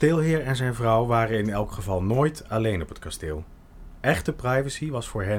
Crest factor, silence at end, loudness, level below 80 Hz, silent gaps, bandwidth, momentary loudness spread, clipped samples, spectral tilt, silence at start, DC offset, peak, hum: 18 dB; 0 s; -25 LUFS; -42 dBFS; none; 17 kHz; 11 LU; under 0.1%; -6.5 dB/octave; 0 s; under 0.1%; -8 dBFS; none